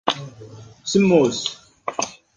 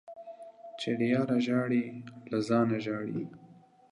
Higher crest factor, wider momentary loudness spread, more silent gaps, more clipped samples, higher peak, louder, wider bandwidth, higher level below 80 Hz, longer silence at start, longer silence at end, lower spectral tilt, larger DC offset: about the same, 18 dB vs 18 dB; about the same, 18 LU vs 19 LU; neither; neither; first, -2 dBFS vs -14 dBFS; first, -20 LUFS vs -31 LUFS; about the same, 10 kHz vs 10.5 kHz; first, -58 dBFS vs -74 dBFS; about the same, 0.05 s vs 0.05 s; second, 0.25 s vs 0.4 s; second, -4.5 dB/octave vs -7 dB/octave; neither